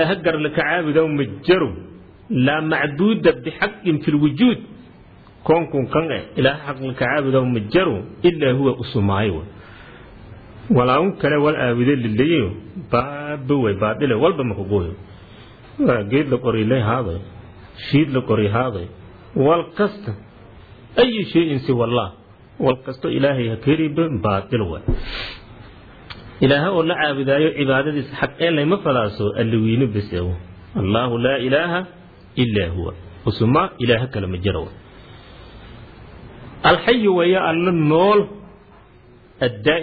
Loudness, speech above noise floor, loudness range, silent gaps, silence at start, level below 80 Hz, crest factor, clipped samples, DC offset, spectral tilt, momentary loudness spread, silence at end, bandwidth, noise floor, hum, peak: -19 LUFS; 29 dB; 3 LU; none; 0 s; -42 dBFS; 18 dB; under 0.1%; under 0.1%; -9.5 dB/octave; 12 LU; 0 s; 4.9 kHz; -47 dBFS; none; -2 dBFS